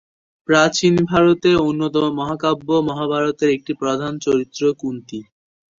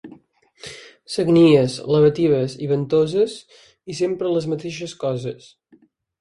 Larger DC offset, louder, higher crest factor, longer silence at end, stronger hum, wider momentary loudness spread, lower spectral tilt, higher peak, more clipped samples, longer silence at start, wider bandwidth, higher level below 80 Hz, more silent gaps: neither; about the same, -18 LUFS vs -19 LUFS; about the same, 18 dB vs 18 dB; second, 0.55 s vs 0.85 s; neither; second, 12 LU vs 23 LU; second, -5.5 dB/octave vs -7 dB/octave; about the same, -2 dBFS vs -4 dBFS; neither; first, 0.5 s vs 0.05 s; second, 7.6 kHz vs 11.5 kHz; first, -52 dBFS vs -58 dBFS; neither